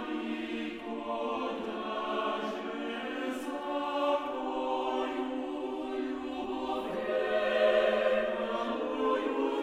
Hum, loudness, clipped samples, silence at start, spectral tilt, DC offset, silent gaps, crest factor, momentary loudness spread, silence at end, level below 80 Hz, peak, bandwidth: none; -32 LUFS; under 0.1%; 0 s; -4.5 dB/octave; under 0.1%; none; 18 dB; 9 LU; 0 s; -64 dBFS; -16 dBFS; 14 kHz